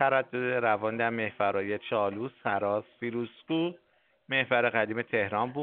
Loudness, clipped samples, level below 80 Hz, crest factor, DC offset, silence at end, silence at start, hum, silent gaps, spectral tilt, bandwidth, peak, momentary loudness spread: -30 LUFS; under 0.1%; -76 dBFS; 20 dB; under 0.1%; 0 s; 0 s; none; none; -3 dB/octave; 4.4 kHz; -10 dBFS; 8 LU